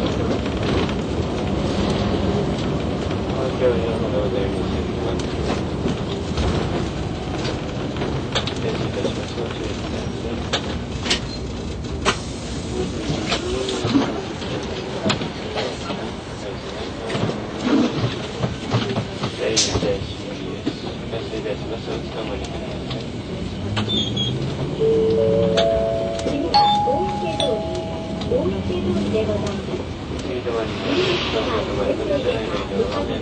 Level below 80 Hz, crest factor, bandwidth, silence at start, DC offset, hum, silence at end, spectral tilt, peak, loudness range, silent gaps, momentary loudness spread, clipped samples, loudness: -36 dBFS; 18 dB; 9.4 kHz; 0 s; under 0.1%; none; 0 s; -5 dB/octave; -4 dBFS; 5 LU; none; 9 LU; under 0.1%; -23 LUFS